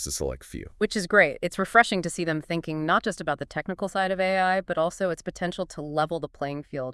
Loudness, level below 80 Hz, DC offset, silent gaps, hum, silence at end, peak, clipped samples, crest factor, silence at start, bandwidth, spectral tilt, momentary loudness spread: -26 LUFS; -50 dBFS; under 0.1%; none; none; 0 s; -4 dBFS; under 0.1%; 22 dB; 0 s; 12 kHz; -4.5 dB/octave; 12 LU